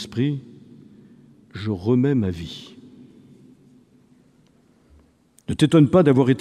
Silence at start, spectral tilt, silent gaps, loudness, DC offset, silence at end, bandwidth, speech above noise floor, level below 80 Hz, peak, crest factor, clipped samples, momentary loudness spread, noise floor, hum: 0 s; -7.5 dB/octave; none; -20 LUFS; under 0.1%; 0 s; 11.5 kHz; 39 dB; -54 dBFS; -4 dBFS; 18 dB; under 0.1%; 23 LU; -57 dBFS; none